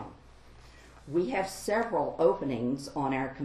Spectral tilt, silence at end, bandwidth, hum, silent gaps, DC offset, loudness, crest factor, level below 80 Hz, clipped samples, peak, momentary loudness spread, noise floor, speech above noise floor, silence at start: -6 dB/octave; 0 s; 13 kHz; none; none; under 0.1%; -30 LUFS; 18 dB; -56 dBFS; under 0.1%; -12 dBFS; 6 LU; -53 dBFS; 23 dB; 0 s